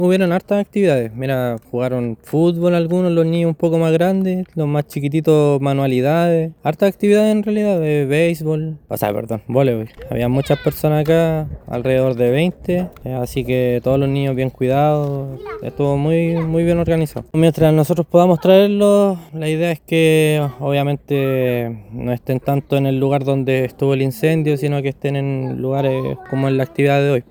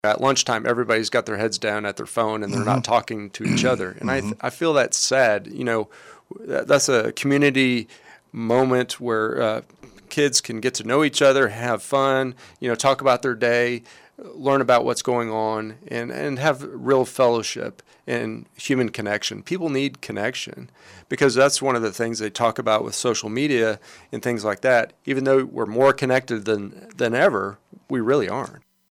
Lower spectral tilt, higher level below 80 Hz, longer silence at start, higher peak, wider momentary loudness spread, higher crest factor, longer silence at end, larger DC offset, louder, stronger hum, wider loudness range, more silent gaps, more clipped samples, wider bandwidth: first, -7.5 dB/octave vs -4 dB/octave; first, -44 dBFS vs -64 dBFS; about the same, 0 s vs 0.05 s; first, 0 dBFS vs -4 dBFS; second, 8 LU vs 12 LU; about the same, 16 dB vs 18 dB; second, 0.1 s vs 0.4 s; neither; first, -17 LUFS vs -21 LUFS; neither; about the same, 4 LU vs 3 LU; neither; neither; first, over 20 kHz vs 16 kHz